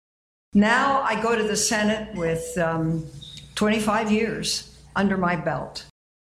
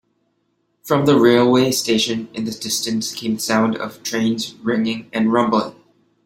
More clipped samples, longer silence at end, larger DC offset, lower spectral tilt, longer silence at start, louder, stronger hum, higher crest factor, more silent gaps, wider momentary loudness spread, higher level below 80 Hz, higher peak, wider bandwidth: neither; about the same, 0.55 s vs 0.55 s; neither; about the same, -4 dB/octave vs -4.5 dB/octave; second, 0.55 s vs 0.85 s; second, -23 LUFS vs -18 LUFS; neither; about the same, 18 dB vs 18 dB; neither; about the same, 11 LU vs 11 LU; first, -50 dBFS vs -60 dBFS; second, -6 dBFS vs -2 dBFS; about the same, 15 kHz vs 16.5 kHz